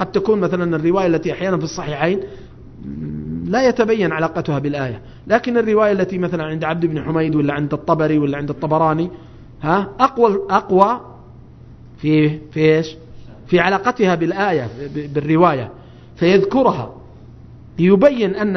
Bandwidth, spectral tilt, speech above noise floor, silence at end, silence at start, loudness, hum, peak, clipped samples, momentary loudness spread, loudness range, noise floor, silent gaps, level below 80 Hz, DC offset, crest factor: 6.4 kHz; -7.5 dB/octave; 23 dB; 0 s; 0 s; -17 LUFS; none; 0 dBFS; under 0.1%; 12 LU; 3 LU; -40 dBFS; none; -46 dBFS; under 0.1%; 18 dB